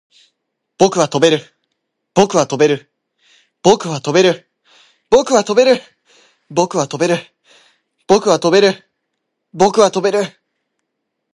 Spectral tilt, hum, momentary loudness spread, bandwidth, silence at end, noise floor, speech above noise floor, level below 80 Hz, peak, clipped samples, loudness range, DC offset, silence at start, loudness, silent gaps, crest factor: -4.5 dB/octave; none; 8 LU; 11.5 kHz; 1.05 s; -74 dBFS; 61 dB; -58 dBFS; 0 dBFS; under 0.1%; 1 LU; under 0.1%; 0.8 s; -14 LUFS; none; 16 dB